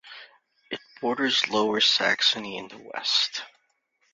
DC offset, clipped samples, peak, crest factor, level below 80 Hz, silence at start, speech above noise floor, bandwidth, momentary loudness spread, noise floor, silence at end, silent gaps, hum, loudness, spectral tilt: under 0.1%; under 0.1%; -8 dBFS; 20 dB; -72 dBFS; 0.05 s; 45 dB; 7.8 kHz; 18 LU; -71 dBFS; 0.65 s; none; none; -23 LUFS; -1.5 dB/octave